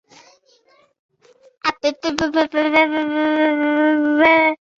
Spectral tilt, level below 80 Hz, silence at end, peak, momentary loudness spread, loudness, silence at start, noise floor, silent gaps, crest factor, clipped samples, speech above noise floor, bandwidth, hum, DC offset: -4 dB/octave; -56 dBFS; 0.2 s; -2 dBFS; 9 LU; -17 LUFS; 1.65 s; -56 dBFS; none; 18 dB; under 0.1%; 40 dB; 7.4 kHz; none; under 0.1%